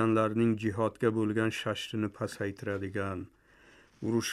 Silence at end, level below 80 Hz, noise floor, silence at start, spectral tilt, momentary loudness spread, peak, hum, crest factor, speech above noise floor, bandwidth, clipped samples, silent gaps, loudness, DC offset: 0 s; -68 dBFS; -60 dBFS; 0 s; -6 dB/octave; 9 LU; -14 dBFS; none; 18 dB; 29 dB; 14 kHz; under 0.1%; none; -32 LUFS; under 0.1%